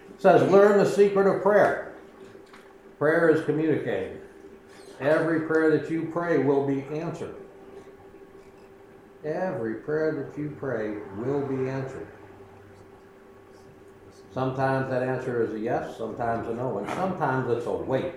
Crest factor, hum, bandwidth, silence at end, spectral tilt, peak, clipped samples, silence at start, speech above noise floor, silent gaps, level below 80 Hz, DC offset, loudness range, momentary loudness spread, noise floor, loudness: 22 dB; none; 12.5 kHz; 0 s; -7.5 dB/octave; -4 dBFS; under 0.1%; 0 s; 26 dB; none; -62 dBFS; under 0.1%; 10 LU; 17 LU; -50 dBFS; -25 LUFS